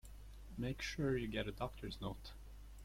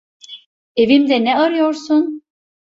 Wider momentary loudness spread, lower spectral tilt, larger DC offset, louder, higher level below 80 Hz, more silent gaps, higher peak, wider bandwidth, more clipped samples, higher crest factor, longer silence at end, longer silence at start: second, 19 LU vs 23 LU; about the same, -5.5 dB/octave vs -5 dB/octave; neither; second, -43 LUFS vs -15 LUFS; first, -54 dBFS vs -60 dBFS; second, none vs 0.46-0.75 s; second, -26 dBFS vs -2 dBFS; first, 16.5 kHz vs 7.8 kHz; neither; about the same, 18 dB vs 16 dB; second, 0 s vs 0.6 s; second, 0.05 s vs 0.3 s